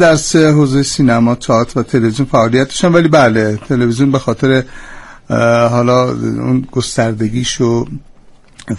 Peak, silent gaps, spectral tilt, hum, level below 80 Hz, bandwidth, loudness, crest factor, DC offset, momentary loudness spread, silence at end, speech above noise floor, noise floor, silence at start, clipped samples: 0 dBFS; none; -5.5 dB/octave; none; -38 dBFS; 11.5 kHz; -12 LUFS; 12 dB; under 0.1%; 7 LU; 0 s; 29 dB; -40 dBFS; 0 s; under 0.1%